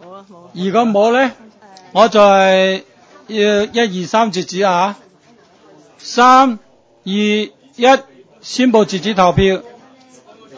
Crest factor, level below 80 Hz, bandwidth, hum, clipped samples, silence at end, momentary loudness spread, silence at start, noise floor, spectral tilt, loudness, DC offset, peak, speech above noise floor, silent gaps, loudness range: 14 dB; -44 dBFS; 8 kHz; none; under 0.1%; 0.9 s; 15 LU; 0.05 s; -48 dBFS; -5 dB/octave; -13 LUFS; under 0.1%; 0 dBFS; 36 dB; none; 3 LU